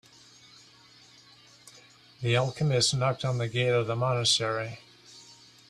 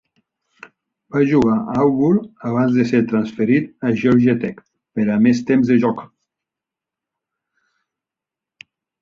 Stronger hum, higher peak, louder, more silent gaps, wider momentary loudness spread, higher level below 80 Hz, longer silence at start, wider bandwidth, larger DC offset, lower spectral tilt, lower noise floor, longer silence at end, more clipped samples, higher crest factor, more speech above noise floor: neither; second, -12 dBFS vs -2 dBFS; second, -27 LUFS vs -17 LUFS; neither; first, 22 LU vs 8 LU; second, -64 dBFS vs -54 dBFS; first, 1.65 s vs 1.15 s; first, 12.5 kHz vs 7 kHz; neither; second, -4 dB/octave vs -8 dB/octave; second, -56 dBFS vs -87 dBFS; second, 0.35 s vs 2.95 s; neither; about the same, 18 dB vs 16 dB; second, 29 dB vs 71 dB